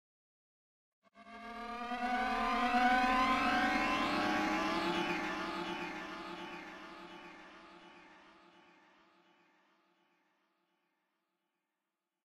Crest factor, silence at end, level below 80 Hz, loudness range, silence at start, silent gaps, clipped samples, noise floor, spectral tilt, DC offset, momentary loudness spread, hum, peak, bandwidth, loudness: 20 dB; 4.1 s; -60 dBFS; 19 LU; 1.15 s; none; under 0.1%; -90 dBFS; -4 dB/octave; under 0.1%; 21 LU; none; -18 dBFS; 15 kHz; -34 LUFS